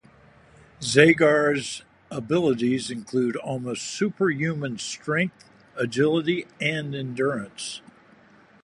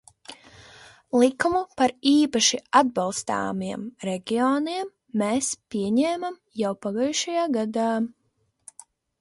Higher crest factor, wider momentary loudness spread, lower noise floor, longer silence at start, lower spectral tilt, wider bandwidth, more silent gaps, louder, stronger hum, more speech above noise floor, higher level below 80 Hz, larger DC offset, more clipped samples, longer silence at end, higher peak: about the same, 24 dB vs 20 dB; first, 16 LU vs 12 LU; second, -54 dBFS vs -71 dBFS; first, 0.8 s vs 0.3 s; first, -5 dB/octave vs -3.5 dB/octave; about the same, 11.5 kHz vs 11.5 kHz; neither; about the same, -24 LUFS vs -24 LUFS; neither; second, 31 dB vs 47 dB; about the same, -64 dBFS vs -64 dBFS; neither; neither; second, 0.85 s vs 1.15 s; about the same, -2 dBFS vs -4 dBFS